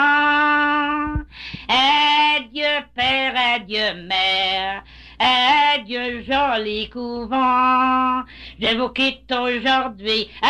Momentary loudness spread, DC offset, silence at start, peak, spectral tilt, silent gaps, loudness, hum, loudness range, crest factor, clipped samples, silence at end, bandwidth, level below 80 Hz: 11 LU; under 0.1%; 0 s; -8 dBFS; -3.5 dB/octave; none; -18 LUFS; none; 2 LU; 12 dB; under 0.1%; 0 s; 10.5 kHz; -44 dBFS